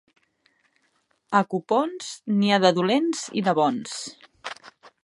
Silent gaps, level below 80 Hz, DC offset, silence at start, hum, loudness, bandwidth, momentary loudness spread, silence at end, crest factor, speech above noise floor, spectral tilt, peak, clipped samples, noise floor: none; -76 dBFS; under 0.1%; 1.3 s; none; -23 LUFS; 11.5 kHz; 19 LU; 0.15 s; 22 dB; 46 dB; -5 dB/octave; -4 dBFS; under 0.1%; -69 dBFS